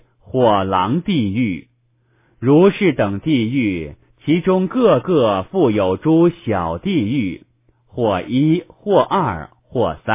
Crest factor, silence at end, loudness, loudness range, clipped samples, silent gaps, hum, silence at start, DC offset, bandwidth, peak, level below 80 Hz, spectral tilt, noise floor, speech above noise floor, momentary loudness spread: 16 dB; 0 s; -17 LUFS; 3 LU; under 0.1%; none; none; 0.3 s; under 0.1%; 3.8 kHz; 0 dBFS; -44 dBFS; -11.5 dB/octave; -60 dBFS; 44 dB; 11 LU